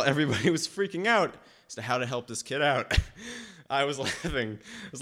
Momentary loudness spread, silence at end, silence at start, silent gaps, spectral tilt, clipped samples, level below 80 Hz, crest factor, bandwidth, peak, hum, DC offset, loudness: 16 LU; 0 s; 0 s; none; -4 dB/octave; under 0.1%; -42 dBFS; 20 dB; 16 kHz; -10 dBFS; none; under 0.1%; -28 LUFS